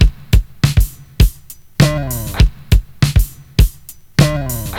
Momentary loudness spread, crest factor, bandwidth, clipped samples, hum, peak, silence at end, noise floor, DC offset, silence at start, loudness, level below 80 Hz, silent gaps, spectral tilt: 6 LU; 14 dB; 18 kHz; under 0.1%; none; 0 dBFS; 0 s; -37 dBFS; under 0.1%; 0 s; -16 LUFS; -16 dBFS; none; -5.5 dB/octave